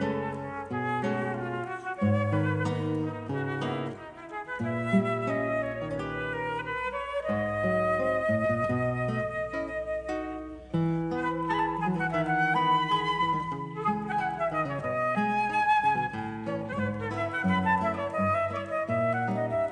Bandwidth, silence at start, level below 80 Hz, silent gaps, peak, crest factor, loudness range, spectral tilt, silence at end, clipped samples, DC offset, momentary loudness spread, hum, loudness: 10 kHz; 0 s; -56 dBFS; none; -12 dBFS; 16 dB; 3 LU; -7 dB/octave; 0 s; under 0.1%; under 0.1%; 8 LU; none; -29 LUFS